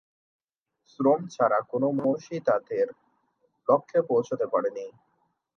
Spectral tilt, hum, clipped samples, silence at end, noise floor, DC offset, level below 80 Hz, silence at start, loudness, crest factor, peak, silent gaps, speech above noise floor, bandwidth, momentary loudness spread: -7.5 dB/octave; none; under 0.1%; 0.65 s; -75 dBFS; under 0.1%; -78 dBFS; 1 s; -26 LUFS; 20 dB; -8 dBFS; none; 49 dB; 6.8 kHz; 7 LU